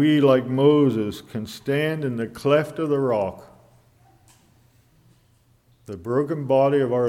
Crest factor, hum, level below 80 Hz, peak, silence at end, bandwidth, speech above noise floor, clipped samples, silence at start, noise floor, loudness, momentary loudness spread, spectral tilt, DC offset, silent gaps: 18 dB; none; -60 dBFS; -6 dBFS; 0 s; 15.5 kHz; 39 dB; under 0.1%; 0 s; -60 dBFS; -22 LUFS; 13 LU; -7.5 dB/octave; under 0.1%; none